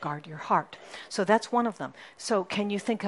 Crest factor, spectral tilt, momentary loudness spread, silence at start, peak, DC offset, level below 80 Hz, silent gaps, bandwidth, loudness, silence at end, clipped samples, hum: 22 dB; -4.5 dB/octave; 15 LU; 0 s; -8 dBFS; under 0.1%; -76 dBFS; none; 11.5 kHz; -29 LUFS; 0 s; under 0.1%; none